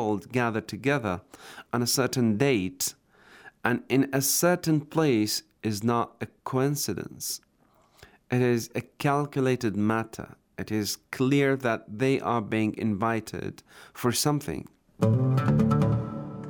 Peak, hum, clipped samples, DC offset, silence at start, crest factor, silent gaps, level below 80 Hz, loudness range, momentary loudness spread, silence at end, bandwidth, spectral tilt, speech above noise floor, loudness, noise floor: -6 dBFS; none; under 0.1%; under 0.1%; 0 s; 20 dB; none; -58 dBFS; 3 LU; 12 LU; 0 s; over 20 kHz; -5 dB/octave; 37 dB; -27 LUFS; -63 dBFS